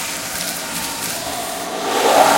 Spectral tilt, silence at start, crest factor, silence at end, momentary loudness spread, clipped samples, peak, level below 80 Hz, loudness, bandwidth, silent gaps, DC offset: -1.5 dB/octave; 0 s; 18 dB; 0 s; 9 LU; under 0.1%; 0 dBFS; -52 dBFS; -20 LUFS; 17 kHz; none; under 0.1%